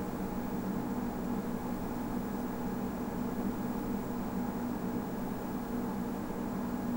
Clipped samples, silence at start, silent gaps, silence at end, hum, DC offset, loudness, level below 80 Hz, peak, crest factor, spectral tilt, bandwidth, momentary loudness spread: under 0.1%; 0 s; none; 0 s; none; under 0.1%; -37 LUFS; -50 dBFS; -22 dBFS; 14 dB; -7 dB/octave; 16 kHz; 2 LU